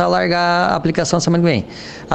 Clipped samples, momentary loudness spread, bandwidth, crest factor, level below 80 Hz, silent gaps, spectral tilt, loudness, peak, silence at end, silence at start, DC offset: under 0.1%; 9 LU; 8.8 kHz; 16 dB; -44 dBFS; none; -5 dB/octave; -16 LUFS; 0 dBFS; 0 s; 0 s; under 0.1%